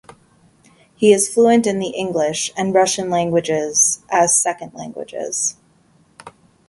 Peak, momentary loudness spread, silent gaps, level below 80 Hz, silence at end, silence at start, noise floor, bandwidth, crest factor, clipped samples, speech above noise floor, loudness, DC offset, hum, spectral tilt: 0 dBFS; 12 LU; none; -60 dBFS; 0.4 s; 1 s; -55 dBFS; 12 kHz; 18 dB; under 0.1%; 38 dB; -17 LUFS; under 0.1%; none; -3 dB/octave